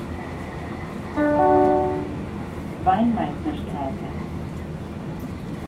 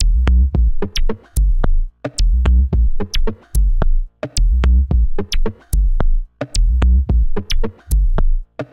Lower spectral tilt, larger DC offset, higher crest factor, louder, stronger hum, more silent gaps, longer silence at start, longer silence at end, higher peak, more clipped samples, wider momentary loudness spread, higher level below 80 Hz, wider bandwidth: first, -8 dB/octave vs -5.5 dB/octave; neither; first, 18 dB vs 12 dB; second, -25 LUFS vs -19 LUFS; neither; neither; about the same, 0 s vs 0 s; about the same, 0 s vs 0.1 s; second, -6 dBFS vs -2 dBFS; neither; first, 15 LU vs 9 LU; second, -42 dBFS vs -14 dBFS; about the same, 14.5 kHz vs 13.5 kHz